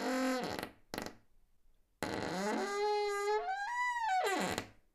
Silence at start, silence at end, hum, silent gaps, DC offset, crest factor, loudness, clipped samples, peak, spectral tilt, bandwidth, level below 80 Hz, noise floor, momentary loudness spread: 0 s; 0.2 s; none; none; under 0.1%; 20 dB; -36 LUFS; under 0.1%; -16 dBFS; -3.5 dB/octave; 15.5 kHz; -66 dBFS; -67 dBFS; 11 LU